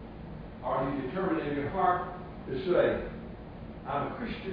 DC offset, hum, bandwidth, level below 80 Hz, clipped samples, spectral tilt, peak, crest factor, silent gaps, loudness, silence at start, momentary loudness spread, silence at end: under 0.1%; none; 5.2 kHz; -50 dBFS; under 0.1%; -5.5 dB/octave; -14 dBFS; 18 dB; none; -31 LUFS; 0 s; 17 LU; 0 s